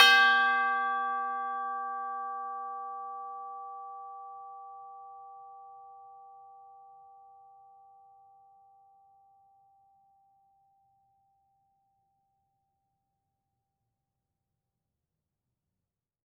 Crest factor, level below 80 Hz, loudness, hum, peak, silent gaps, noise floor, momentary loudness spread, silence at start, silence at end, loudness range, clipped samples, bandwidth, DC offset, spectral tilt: 28 dB; under -90 dBFS; -29 LUFS; none; -6 dBFS; none; -89 dBFS; 26 LU; 0 s; 9.5 s; 25 LU; under 0.1%; 16 kHz; under 0.1%; 1.5 dB/octave